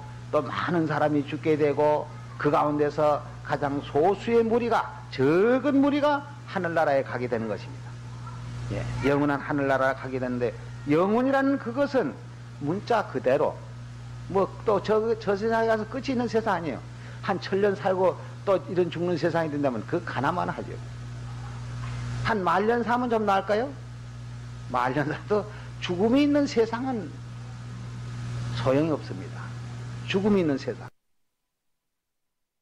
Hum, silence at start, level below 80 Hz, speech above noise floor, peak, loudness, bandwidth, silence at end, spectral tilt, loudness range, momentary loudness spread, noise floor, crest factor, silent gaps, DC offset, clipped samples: 60 Hz at -40 dBFS; 0 s; -50 dBFS; 54 dB; -14 dBFS; -26 LUFS; 11.5 kHz; 1.7 s; -7 dB/octave; 5 LU; 16 LU; -79 dBFS; 12 dB; none; under 0.1%; under 0.1%